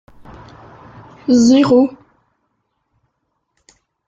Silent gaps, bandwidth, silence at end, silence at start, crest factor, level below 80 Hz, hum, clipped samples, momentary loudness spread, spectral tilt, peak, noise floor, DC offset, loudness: none; 7.8 kHz; 2.2 s; 1.3 s; 16 dB; -54 dBFS; none; under 0.1%; 10 LU; -5.5 dB/octave; -2 dBFS; -71 dBFS; under 0.1%; -13 LUFS